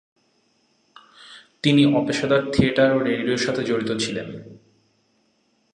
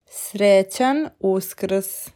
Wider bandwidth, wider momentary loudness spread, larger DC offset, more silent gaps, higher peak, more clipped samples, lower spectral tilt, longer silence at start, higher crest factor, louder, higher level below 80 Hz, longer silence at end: second, 11 kHz vs 18 kHz; about the same, 9 LU vs 8 LU; neither; neither; first, -2 dBFS vs -6 dBFS; neither; about the same, -5.5 dB/octave vs -4.5 dB/octave; first, 1.2 s vs 0.15 s; first, 20 dB vs 14 dB; about the same, -21 LUFS vs -20 LUFS; first, -50 dBFS vs -64 dBFS; first, 1.2 s vs 0.05 s